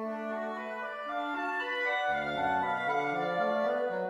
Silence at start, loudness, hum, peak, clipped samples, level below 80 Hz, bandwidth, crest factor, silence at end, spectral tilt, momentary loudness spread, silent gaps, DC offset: 0 s; -32 LUFS; none; -18 dBFS; under 0.1%; -68 dBFS; 12 kHz; 14 dB; 0 s; -5.5 dB/octave; 7 LU; none; under 0.1%